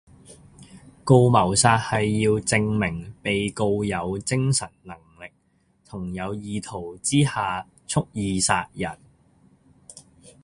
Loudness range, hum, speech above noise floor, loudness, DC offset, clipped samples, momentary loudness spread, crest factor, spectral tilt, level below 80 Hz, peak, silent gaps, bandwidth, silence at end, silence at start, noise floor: 7 LU; none; 42 dB; -23 LUFS; under 0.1%; under 0.1%; 18 LU; 22 dB; -4.5 dB/octave; -48 dBFS; -2 dBFS; none; 11.5 kHz; 0.15 s; 0.3 s; -65 dBFS